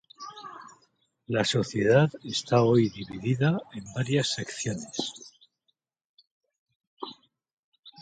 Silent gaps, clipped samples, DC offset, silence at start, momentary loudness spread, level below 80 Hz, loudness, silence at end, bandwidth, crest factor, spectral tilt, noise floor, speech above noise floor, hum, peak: 6.05-6.18 s, 6.31-6.41 s, 6.59-6.66 s, 6.76-6.80 s, 6.87-6.97 s, 7.53-7.72 s, 7.79-7.83 s; under 0.1%; under 0.1%; 0.2 s; 20 LU; -64 dBFS; -27 LUFS; 0 s; 9.4 kHz; 22 dB; -5.5 dB/octave; -77 dBFS; 51 dB; none; -8 dBFS